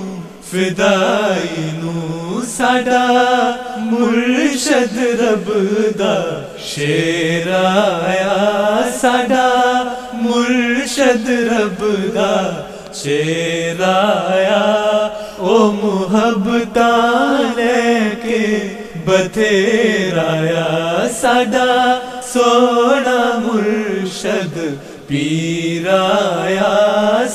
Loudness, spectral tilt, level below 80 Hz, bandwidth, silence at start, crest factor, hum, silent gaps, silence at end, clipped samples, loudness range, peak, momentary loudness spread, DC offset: -15 LUFS; -4.5 dB/octave; -50 dBFS; 15 kHz; 0 s; 14 dB; none; none; 0 s; under 0.1%; 2 LU; 0 dBFS; 9 LU; under 0.1%